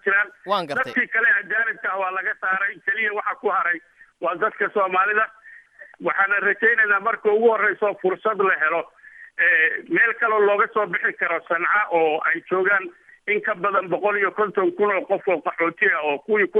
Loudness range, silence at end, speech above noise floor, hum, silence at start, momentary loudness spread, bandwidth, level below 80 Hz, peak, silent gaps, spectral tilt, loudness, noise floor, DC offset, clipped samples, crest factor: 3 LU; 0 s; 25 dB; none; 0.05 s; 7 LU; 6 kHz; -74 dBFS; -6 dBFS; none; -6 dB/octave; -21 LUFS; -46 dBFS; under 0.1%; under 0.1%; 16 dB